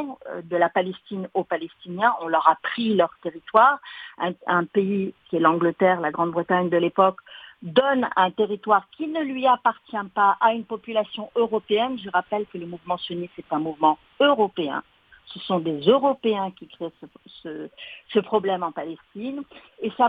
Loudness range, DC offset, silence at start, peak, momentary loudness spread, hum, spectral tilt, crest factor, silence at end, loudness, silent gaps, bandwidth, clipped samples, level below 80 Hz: 4 LU; under 0.1%; 0 s; -2 dBFS; 16 LU; none; -8 dB/octave; 22 dB; 0 s; -23 LUFS; none; 4.9 kHz; under 0.1%; -70 dBFS